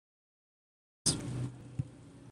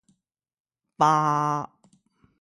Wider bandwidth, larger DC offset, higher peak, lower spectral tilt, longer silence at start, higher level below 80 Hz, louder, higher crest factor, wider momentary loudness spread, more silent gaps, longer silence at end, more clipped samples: about the same, 12.5 kHz vs 11.5 kHz; neither; second, -16 dBFS vs -6 dBFS; second, -3.5 dB/octave vs -5.5 dB/octave; about the same, 1.05 s vs 1 s; first, -60 dBFS vs -70 dBFS; second, -36 LUFS vs -23 LUFS; first, 26 dB vs 20 dB; about the same, 12 LU vs 12 LU; neither; second, 0 s vs 0.75 s; neither